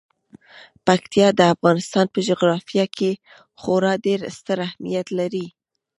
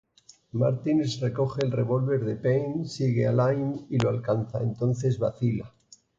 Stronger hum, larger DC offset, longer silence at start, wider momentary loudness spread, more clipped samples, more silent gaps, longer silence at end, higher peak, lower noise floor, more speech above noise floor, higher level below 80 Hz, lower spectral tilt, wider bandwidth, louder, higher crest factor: neither; neither; about the same, 0.55 s vs 0.55 s; first, 10 LU vs 5 LU; neither; neither; about the same, 0.5 s vs 0.5 s; first, -2 dBFS vs -12 dBFS; second, -48 dBFS vs -55 dBFS; about the same, 28 dB vs 29 dB; about the same, -62 dBFS vs -58 dBFS; second, -5.5 dB/octave vs -8 dB/octave; first, 11.5 kHz vs 7.6 kHz; first, -20 LUFS vs -27 LUFS; first, 20 dB vs 14 dB